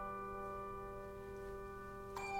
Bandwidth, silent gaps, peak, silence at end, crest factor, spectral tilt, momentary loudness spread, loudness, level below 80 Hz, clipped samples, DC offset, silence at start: 16 kHz; none; -32 dBFS; 0 s; 14 dB; -5.5 dB/octave; 4 LU; -48 LUFS; -58 dBFS; under 0.1%; under 0.1%; 0 s